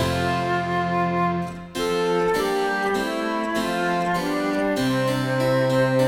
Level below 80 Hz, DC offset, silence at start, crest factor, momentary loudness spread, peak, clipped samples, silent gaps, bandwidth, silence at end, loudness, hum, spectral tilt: -48 dBFS; 0.1%; 0 s; 14 dB; 4 LU; -8 dBFS; under 0.1%; none; 17 kHz; 0 s; -23 LUFS; none; -5.5 dB/octave